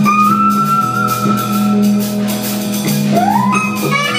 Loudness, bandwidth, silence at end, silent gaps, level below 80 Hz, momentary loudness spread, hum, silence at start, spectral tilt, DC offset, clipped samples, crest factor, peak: -13 LUFS; 16 kHz; 0 s; none; -54 dBFS; 6 LU; none; 0 s; -5 dB/octave; under 0.1%; under 0.1%; 12 dB; 0 dBFS